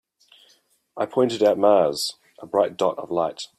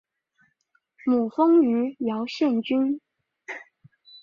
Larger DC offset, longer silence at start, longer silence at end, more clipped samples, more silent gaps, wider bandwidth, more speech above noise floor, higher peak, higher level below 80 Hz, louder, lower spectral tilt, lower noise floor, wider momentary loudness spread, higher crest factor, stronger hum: neither; about the same, 0.95 s vs 1.05 s; second, 0.15 s vs 0.65 s; neither; neither; first, 15 kHz vs 7.2 kHz; second, 40 dB vs 49 dB; first, -6 dBFS vs -10 dBFS; about the same, -68 dBFS vs -72 dBFS; about the same, -22 LUFS vs -23 LUFS; second, -4.5 dB/octave vs -6.5 dB/octave; second, -61 dBFS vs -70 dBFS; second, 9 LU vs 19 LU; about the same, 18 dB vs 16 dB; neither